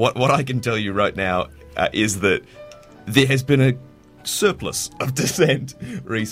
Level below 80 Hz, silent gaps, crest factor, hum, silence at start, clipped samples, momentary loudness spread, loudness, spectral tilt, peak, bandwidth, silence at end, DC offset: -48 dBFS; none; 18 dB; none; 0 s; under 0.1%; 11 LU; -20 LUFS; -4.5 dB/octave; -2 dBFS; 16 kHz; 0 s; under 0.1%